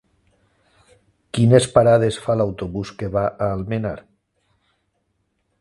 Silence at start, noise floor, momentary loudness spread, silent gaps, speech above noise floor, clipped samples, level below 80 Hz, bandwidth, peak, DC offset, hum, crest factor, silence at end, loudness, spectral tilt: 1.35 s; -70 dBFS; 14 LU; none; 52 dB; under 0.1%; -46 dBFS; 11.5 kHz; 0 dBFS; under 0.1%; none; 20 dB; 1.6 s; -19 LUFS; -6.5 dB/octave